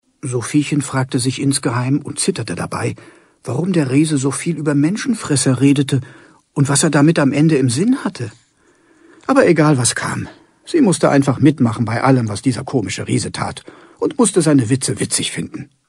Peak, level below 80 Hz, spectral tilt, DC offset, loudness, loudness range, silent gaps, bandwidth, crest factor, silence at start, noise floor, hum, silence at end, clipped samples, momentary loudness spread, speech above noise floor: 0 dBFS; -54 dBFS; -5 dB/octave; under 0.1%; -16 LUFS; 4 LU; none; 12.5 kHz; 16 dB; 0.25 s; -54 dBFS; none; 0.25 s; under 0.1%; 12 LU; 39 dB